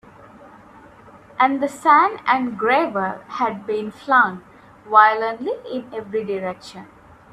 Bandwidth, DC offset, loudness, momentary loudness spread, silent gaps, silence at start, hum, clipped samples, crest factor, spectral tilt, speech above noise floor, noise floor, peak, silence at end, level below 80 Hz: 13 kHz; under 0.1%; -19 LUFS; 15 LU; none; 0.45 s; none; under 0.1%; 20 dB; -5 dB/octave; 26 dB; -46 dBFS; 0 dBFS; 0.5 s; -62 dBFS